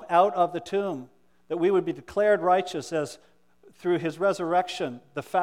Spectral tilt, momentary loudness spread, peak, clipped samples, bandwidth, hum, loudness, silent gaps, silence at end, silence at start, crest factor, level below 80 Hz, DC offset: -5.5 dB/octave; 11 LU; -8 dBFS; under 0.1%; 14.5 kHz; none; -26 LUFS; none; 0 s; 0 s; 18 dB; -68 dBFS; under 0.1%